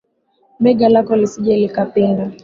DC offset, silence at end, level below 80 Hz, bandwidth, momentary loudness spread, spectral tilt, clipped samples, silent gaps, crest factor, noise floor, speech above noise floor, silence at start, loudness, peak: under 0.1%; 0.1 s; -54 dBFS; 7.6 kHz; 5 LU; -7.5 dB/octave; under 0.1%; none; 14 dB; -59 dBFS; 45 dB; 0.6 s; -15 LUFS; -2 dBFS